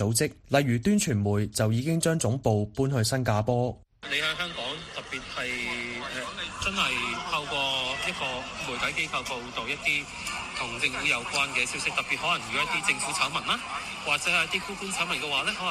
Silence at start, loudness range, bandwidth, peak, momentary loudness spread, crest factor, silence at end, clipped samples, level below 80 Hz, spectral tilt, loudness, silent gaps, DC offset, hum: 0 s; 4 LU; 15 kHz; -8 dBFS; 8 LU; 20 dB; 0 s; under 0.1%; -52 dBFS; -3.5 dB/octave; -27 LUFS; none; under 0.1%; none